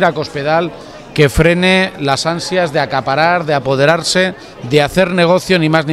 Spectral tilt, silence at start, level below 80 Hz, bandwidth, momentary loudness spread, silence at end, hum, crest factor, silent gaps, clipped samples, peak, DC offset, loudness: -5 dB/octave; 0 s; -34 dBFS; 15 kHz; 6 LU; 0 s; none; 14 dB; none; under 0.1%; 0 dBFS; under 0.1%; -13 LUFS